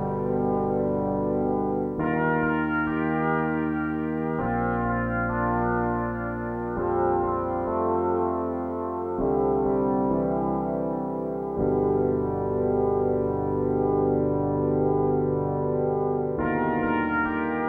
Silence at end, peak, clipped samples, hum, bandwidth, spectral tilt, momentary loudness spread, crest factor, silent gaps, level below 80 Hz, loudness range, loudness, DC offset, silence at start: 0 s; -12 dBFS; under 0.1%; none; 3.5 kHz; -11 dB/octave; 4 LU; 14 dB; none; -44 dBFS; 2 LU; -25 LUFS; under 0.1%; 0 s